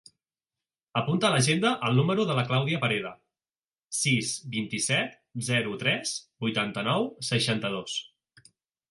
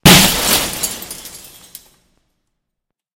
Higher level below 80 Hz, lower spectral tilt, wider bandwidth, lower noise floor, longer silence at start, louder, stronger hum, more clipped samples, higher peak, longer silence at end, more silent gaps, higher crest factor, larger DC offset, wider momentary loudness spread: second, -68 dBFS vs -34 dBFS; first, -4 dB/octave vs -2.5 dB/octave; second, 11.5 kHz vs over 20 kHz; first, under -90 dBFS vs -78 dBFS; first, 0.95 s vs 0.05 s; second, -27 LUFS vs -12 LUFS; neither; second, under 0.1% vs 0.4%; second, -10 dBFS vs 0 dBFS; second, 0.9 s vs 1.8 s; first, 3.58-3.62 s vs none; about the same, 18 dB vs 16 dB; neither; second, 9 LU vs 27 LU